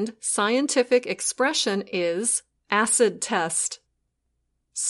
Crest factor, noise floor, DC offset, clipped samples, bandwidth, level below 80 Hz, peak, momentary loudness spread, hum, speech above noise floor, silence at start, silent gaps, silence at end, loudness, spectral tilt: 18 dB; -75 dBFS; under 0.1%; under 0.1%; 11.5 kHz; -72 dBFS; -6 dBFS; 6 LU; none; 51 dB; 0 s; none; 0 s; -23 LUFS; -2 dB/octave